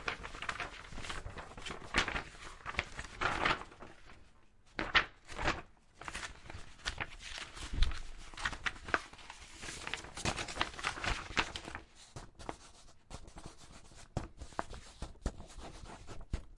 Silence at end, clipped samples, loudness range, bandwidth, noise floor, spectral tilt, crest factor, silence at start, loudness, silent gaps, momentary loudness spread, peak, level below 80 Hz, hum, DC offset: 0 s; under 0.1%; 11 LU; 11.5 kHz; -61 dBFS; -3 dB/octave; 30 dB; 0 s; -39 LUFS; none; 19 LU; -10 dBFS; -48 dBFS; none; under 0.1%